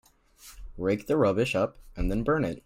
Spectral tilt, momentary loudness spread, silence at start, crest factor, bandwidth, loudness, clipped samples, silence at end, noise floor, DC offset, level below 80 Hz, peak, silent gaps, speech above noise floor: -6.5 dB/octave; 11 LU; 0.45 s; 14 dB; 16.5 kHz; -28 LUFS; under 0.1%; 0.05 s; -54 dBFS; under 0.1%; -40 dBFS; -14 dBFS; none; 27 dB